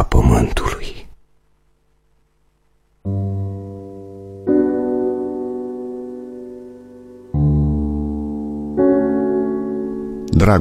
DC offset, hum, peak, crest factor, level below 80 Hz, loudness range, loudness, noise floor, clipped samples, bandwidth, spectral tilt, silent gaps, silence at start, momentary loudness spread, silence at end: under 0.1%; none; -2 dBFS; 18 dB; -28 dBFS; 10 LU; -20 LUFS; -60 dBFS; under 0.1%; 14.5 kHz; -8 dB/octave; none; 0 s; 19 LU; 0 s